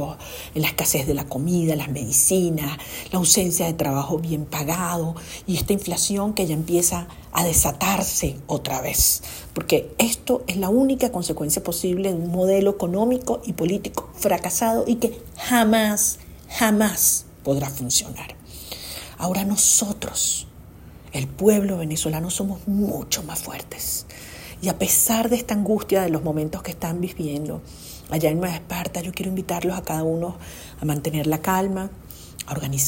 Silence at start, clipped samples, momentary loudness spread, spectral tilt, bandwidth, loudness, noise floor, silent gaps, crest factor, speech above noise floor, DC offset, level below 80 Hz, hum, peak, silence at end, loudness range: 0 s; under 0.1%; 14 LU; -4 dB/octave; 16.5 kHz; -22 LUFS; -43 dBFS; none; 22 dB; 21 dB; under 0.1%; -44 dBFS; none; 0 dBFS; 0 s; 5 LU